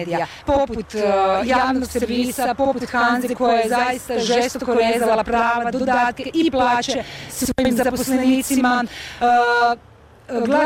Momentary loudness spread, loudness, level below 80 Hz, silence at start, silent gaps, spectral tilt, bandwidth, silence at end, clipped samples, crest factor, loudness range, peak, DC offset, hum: 7 LU; -19 LUFS; -44 dBFS; 0 s; none; -4 dB/octave; 17 kHz; 0 s; under 0.1%; 12 dB; 1 LU; -8 dBFS; under 0.1%; none